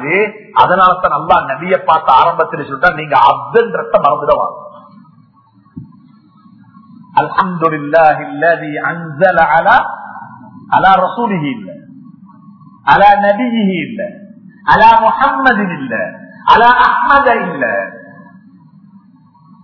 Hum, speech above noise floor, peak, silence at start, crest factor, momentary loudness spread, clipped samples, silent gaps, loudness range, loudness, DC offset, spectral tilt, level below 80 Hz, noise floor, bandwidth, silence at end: none; 37 dB; 0 dBFS; 0 s; 12 dB; 13 LU; 0.4%; none; 6 LU; -11 LUFS; under 0.1%; -7 dB/octave; -44 dBFS; -48 dBFS; 6 kHz; 1.5 s